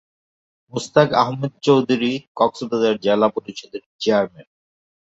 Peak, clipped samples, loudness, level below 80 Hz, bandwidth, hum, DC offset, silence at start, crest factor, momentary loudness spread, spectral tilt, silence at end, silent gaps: -2 dBFS; under 0.1%; -19 LUFS; -62 dBFS; 8 kHz; none; under 0.1%; 0.75 s; 20 dB; 14 LU; -6 dB/octave; 0.65 s; 2.27-2.35 s, 3.86-3.99 s